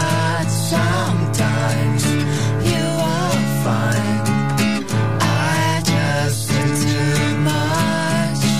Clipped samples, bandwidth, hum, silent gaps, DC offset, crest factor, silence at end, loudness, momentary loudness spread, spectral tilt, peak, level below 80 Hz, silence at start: under 0.1%; 15.5 kHz; none; none; 2%; 12 dB; 0 s; -18 LUFS; 2 LU; -5 dB/octave; -6 dBFS; -42 dBFS; 0 s